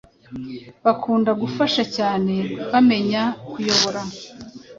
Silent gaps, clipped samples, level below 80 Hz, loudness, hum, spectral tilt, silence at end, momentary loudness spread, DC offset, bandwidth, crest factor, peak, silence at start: none; under 0.1%; -58 dBFS; -20 LUFS; none; -4.5 dB/octave; 0.05 s; 18 LU; under 0.1%; 7.6 kHz; 20 dB; -2 dBFS; 0.3 s